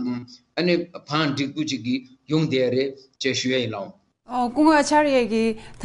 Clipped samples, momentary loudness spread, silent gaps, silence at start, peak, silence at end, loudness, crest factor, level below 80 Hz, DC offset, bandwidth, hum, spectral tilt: under 0.1%; 12 LU; none; 0 s; -6 dBFS; 0 s; -22 LUFS; 18 dB; -56 dBFS; under 0.1%; 11.5 kHz; none; -5 dB/octave